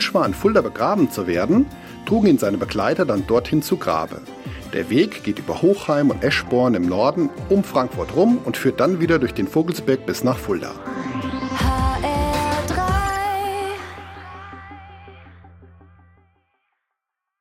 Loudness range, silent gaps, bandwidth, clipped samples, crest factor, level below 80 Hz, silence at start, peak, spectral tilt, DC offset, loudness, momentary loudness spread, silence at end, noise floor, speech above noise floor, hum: 7 LU; none; 16.5 kHz; under 0.1%; 16 dB; -36 dBFS; 0 s; -4 dBFS; -6 dB/octave; under 0.1%; -20 LUFS; 13 LU; 1.75 s; -81 dBFS; 62 dB; none